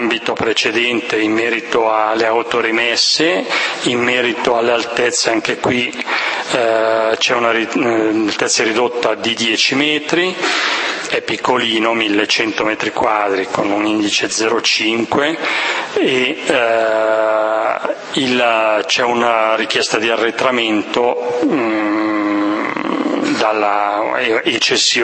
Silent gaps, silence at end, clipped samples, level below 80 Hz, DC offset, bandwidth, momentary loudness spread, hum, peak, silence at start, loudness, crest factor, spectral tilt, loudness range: none; 0 s; under 0.1%; -60 dBFS; under 0.1%; 8.8 kHz; 4 LU; none; 0 dBFS; 0 s; -15 LUFS; 16 dB; -2.5 dB/octave; 1 LU